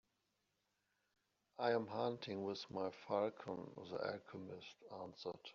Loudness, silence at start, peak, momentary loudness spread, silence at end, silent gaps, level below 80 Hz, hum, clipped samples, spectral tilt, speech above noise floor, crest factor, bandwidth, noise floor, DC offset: -45 LUFS; 1.6 s; -24 dBFS; 13 LU; 0 s; none; -86 dBFS; none; under 0.1%; -4 dB/octave; 41 dB; 22 dB; 7.2 kHz; -86 dBFS; under 0.1%